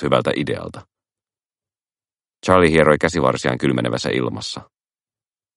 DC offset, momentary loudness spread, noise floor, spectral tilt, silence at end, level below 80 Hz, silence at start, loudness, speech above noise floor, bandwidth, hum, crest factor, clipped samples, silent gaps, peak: under 0.1%; 15 LU; under -90 dBFS; -5.5 dB/octave; 0.95 s; -46 dBFS; 0 s; -18 LUFS; over 72 dB; 11.5 kHz; none; 20 dB; under 0.1%; 1.46-1.50 s; 0 dBFS